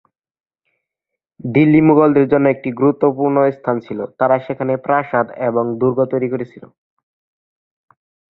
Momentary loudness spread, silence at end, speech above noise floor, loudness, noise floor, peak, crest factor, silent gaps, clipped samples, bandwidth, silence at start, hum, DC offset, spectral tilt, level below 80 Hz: 11 LU; 1.65 s; 67 dB; -16 LUFS; -82 dBFS; 0 dBFS; 16 dB; none; under 0.1%; 4.1 kHz; 1.45 s; none; under 0.1%; -11.5 dB/octave; -56 dBFS